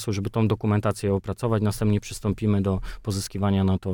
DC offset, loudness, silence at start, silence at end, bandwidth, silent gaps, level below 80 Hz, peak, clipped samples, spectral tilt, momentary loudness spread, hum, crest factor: under 0.1%; -25 LUFS; 0 s; 0 s; 18 kHz; none; -42 dBFS; -10 dBFS; under 0.1%; -7 dB/octave; 6 LU; none; 14 dB